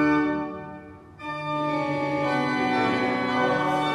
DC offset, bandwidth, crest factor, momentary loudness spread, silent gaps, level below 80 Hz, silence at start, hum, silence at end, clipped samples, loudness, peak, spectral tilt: under 0.1%; 11 kHz; 14 dB; 15 LU; none; -58 dBFS; 0 s; none; 0 s; under 0.1%; -25 LUFS; -10 dBFS; -6 dB/octave